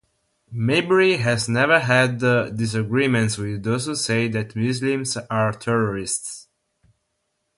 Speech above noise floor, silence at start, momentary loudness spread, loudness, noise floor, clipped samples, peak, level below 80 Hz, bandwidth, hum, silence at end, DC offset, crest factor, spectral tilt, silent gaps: 53 dB; 0.5 s; 9 LU; -21 LUFS; -74 dBFS; under 0.1%; -4 dBFS; -54 dBFS; 11.5 kHz; none; 1.15 s; under 0.1%; 18 dB; -5 dB/octave; none